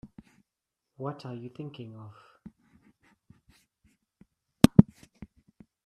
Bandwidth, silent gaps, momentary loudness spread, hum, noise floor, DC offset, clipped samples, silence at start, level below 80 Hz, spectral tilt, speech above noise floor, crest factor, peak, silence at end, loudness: 14 kHz; none; 26 LU; none; -86 dBFS; under 0.1%; under 0.1%; 1 s; -52 dBFS; -7 dB/octave; 46 dB; 30 dB; 0 dBFS; 1.05 s; -24 LUFS